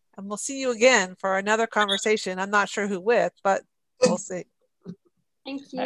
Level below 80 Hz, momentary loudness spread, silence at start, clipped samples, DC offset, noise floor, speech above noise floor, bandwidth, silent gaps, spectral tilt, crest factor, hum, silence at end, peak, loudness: -72 dBFS; 16 LU; 0.2 s; under 0.1%; under 0.1%; -70 dBFS; 46 dB; 12 kHz; none; -3 dB/octave; 20 dB; none; 0 s; -4 dBFS; -23 LUFS